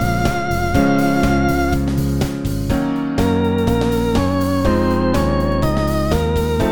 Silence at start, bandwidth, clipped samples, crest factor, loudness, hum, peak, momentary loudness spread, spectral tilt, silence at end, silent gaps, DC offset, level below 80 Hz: 0 s; 19 kHz; under 0.1%; 14 dB; -17 LUFS; none; -2 dBFS; 4 LU; -7 dB/octave; 0 s; none; 2%; -26 dBFS